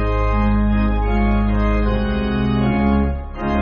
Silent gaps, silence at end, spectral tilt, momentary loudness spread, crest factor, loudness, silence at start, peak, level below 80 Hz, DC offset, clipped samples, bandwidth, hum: none; 0 s; -7 dB/octave; 3 LU; 12 dB; -19 LUFS; 0 s; -4 dBFS; -20 dBFS; under 0.1%; under 0.1%; 5.2 kHz; none